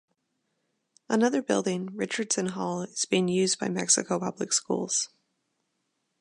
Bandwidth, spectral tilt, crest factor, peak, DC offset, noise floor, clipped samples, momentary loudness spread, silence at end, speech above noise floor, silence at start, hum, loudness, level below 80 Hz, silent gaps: 11.5 kHz; -3.5 dB/octave; 22 dB; -8 dBFS; under 0.1%; -78 dBFS; under 0.1%; 8 LU; 1.15 s; 51 dB; 1.1 s; none; -27 LUFS; -76 dBFS; none